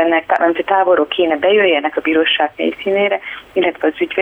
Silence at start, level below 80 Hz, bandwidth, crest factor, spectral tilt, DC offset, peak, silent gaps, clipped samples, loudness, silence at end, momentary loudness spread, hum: 0 s; -56 dBFS; 4.2 kHz; 12 dB; -6 dB/octave; under 0.1%; -2 dBFS; none; under 0.1%; -15 LUFS; 0 s; 6 LU; none